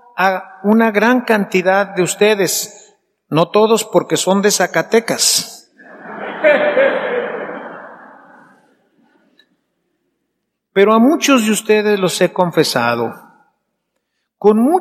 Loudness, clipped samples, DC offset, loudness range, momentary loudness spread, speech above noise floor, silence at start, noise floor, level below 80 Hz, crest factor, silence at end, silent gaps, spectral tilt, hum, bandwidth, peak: -14 LUFS; under 0.1%; under 0.1%; 6 LU; 13 LU; 59 dB; 0.15 s; -73 dBFS; -68 dBFS; 16 dB; 0 s; none; -3.5 dB/octave; none; 15.5 kHz; 0 dBFS